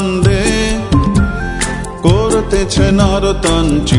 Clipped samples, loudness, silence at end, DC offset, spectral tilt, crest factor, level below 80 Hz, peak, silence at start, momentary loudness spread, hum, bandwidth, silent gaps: under 0.1%; -13 LUFS; 0 s; under 0.1%; -5.5 dB/octave; 12 dB; -20 dBFS; 0 dBFS; 0 s; 6 LU; none; 11 kHz; none